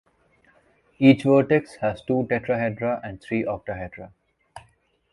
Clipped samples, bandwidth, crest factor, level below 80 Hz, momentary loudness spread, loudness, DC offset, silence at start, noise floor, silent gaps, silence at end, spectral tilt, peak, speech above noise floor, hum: under 0.1%; 11 kHz; 22 dB; -54 dBFS; 15 LU; -23 LUFS; under 0.1%; 1 s; -62 dBFS; none; 0.55 s; -8 dB/octave; -2 dBFS; 40 dB; none